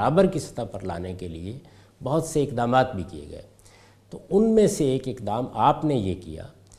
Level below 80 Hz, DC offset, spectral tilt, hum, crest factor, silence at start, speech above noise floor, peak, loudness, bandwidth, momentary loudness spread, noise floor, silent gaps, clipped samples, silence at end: -50 dBFS; under 0.1%; -6.5 dB/octave; none; 20 dB; 0 s; 29 dB; -4 dBFS; -24 LUFS; 14.5 kHz; 20 LU; -53 dBFS; none; under 0.1%; 0.3 s